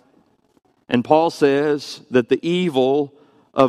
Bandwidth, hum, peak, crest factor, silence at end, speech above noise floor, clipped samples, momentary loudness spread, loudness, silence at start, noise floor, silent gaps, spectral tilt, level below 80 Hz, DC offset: 12.5 kHz; none; 0 dBFS; 18 dB; 0 s; 41 dB; under 0.1%; 8 LU; -19 LUFS; 0.9 s; -59 dBFS; none; -6 dB/octave; -62 dBFS; under 0.1%